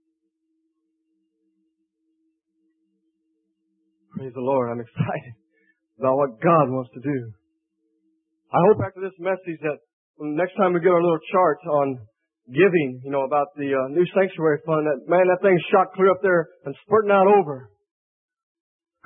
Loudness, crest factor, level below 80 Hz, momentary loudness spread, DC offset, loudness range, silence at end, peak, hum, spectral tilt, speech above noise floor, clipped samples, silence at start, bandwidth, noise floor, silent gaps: -21 LUFS; 18 dB; -68 dBFS; 13 LU; under 0.1%; 11 LU; 1.4 s; -4 dBFS; none; -11.5 dB/octave; 54 dB; under 0.1%; 4.15 s; 3.8 kHz; -75 dBFS; 9.93-10.14 s